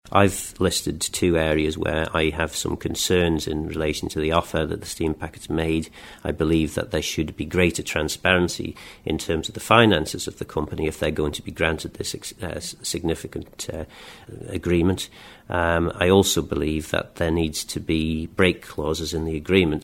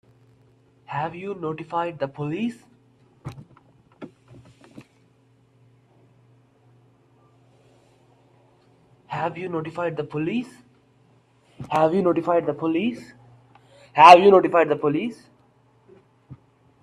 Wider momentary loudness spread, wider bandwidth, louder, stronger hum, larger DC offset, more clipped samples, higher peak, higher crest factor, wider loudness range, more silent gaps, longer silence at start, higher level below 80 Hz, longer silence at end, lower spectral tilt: second, 11 LU vs 26 LU; first, 16.5 kHz vs 11.5 kHz; second, -23 LUFS vs -20 LUFS; neither; neither; neither; about the same, 0 dBFS vs 0 dBFS; about the same, 22 dB vs 24 dB; second, 5 LU vs 17 LU; neither; second, 0.05 s vs 0.9 s; first, -40 dBFS vs -66 dBFS; second, 0 s vs 0.5 s; second, -4.5 dB/octave vs -6 dB/octave